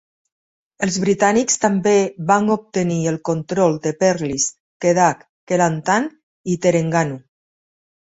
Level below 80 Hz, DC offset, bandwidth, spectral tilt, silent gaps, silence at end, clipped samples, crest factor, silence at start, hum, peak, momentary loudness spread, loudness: -58 dBFS; under 0.1%; 8 kHz; -5 dB/octave; 4.60-4.80 s, 5.29-5.47 s, 6.23-6.44 s; 1 s; under 0.1%; 18 dB; 0.8 s; none; -2 dBFS; 8 LU; -18 LUFS